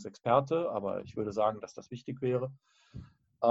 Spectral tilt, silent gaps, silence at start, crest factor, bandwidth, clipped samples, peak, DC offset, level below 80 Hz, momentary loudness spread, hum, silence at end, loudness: -7.5 dB/octave; none; 0 s; 20 dB; 7.8 kHz; under 0.1%; -12 dBFS; under 0.1%; -66 dBFS; 22 LU; none; 0 s; -32 LUFS